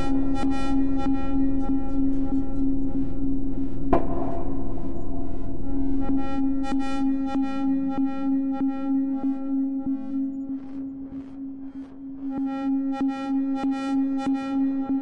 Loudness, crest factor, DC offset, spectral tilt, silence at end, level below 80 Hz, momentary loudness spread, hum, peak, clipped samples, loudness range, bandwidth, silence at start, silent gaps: -27 LUFS; 16 dB; under 0.1%; -8 dB/octave; 0 s; -36 dBFS; 9 LU; none; -6 dBFS; under 0.1%; 4 LU; 7.8 kHz; 0 s; none